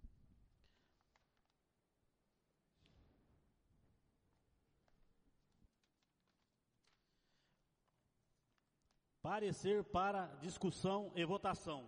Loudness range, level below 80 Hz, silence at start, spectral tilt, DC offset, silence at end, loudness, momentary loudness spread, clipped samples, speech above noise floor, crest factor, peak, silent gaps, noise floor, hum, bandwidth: 9 LU; -72 dBFS; 0.05 s; -5.5 dB/octave; under 0.1%; 0 s; -42 LUFS; 6 LU; under 0.1%; 44 dB; 20 dB; -28 dBFS; none; -86 dBFS; none; 10 kHz